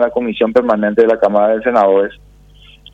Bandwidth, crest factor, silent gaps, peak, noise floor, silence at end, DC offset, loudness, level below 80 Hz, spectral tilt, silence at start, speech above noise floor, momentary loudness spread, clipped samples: 6.6 kHz; 12 dB; none; 0 dBFS; -43 dBFS; 0.8 s; under 0.1%; -13 LUFS; -48 dBFS; -7.5 dB/octave; 0 s; 30 dB; 5 LU; under 0.1%